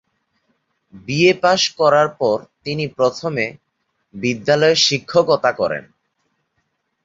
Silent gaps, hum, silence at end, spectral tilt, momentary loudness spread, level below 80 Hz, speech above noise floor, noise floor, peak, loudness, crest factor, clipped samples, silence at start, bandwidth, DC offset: none; none; 1.25 s; -4 dB/octave; 11 LU; -60 dBFS; 54 dB; -71 dBFS; 0 dBFS; -17 LUFS; 18 dB; under 0.1%; 0.95 s; 7.8 kHz; under 0.1%